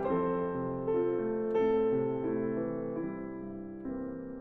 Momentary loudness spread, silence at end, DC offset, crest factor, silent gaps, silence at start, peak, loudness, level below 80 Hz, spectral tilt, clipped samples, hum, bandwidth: 12 LU; 0 s; under 0.1%; 12 dB; none; 0 s; -20 dBFS; -33 LUFS; -58 dBFS; -10 dB/octave; under 0.1%; none; 4 kHz